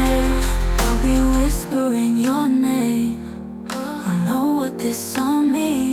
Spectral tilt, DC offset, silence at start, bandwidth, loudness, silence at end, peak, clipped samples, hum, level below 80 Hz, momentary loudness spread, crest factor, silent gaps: -5.5 dB/octave; under 0.1%; 0 s; 17.5 kHz; -20 LUFS; 0 s; -6 dBFS; under 0.1%; none; -26 dBFS; 8 LU; 12 dB; none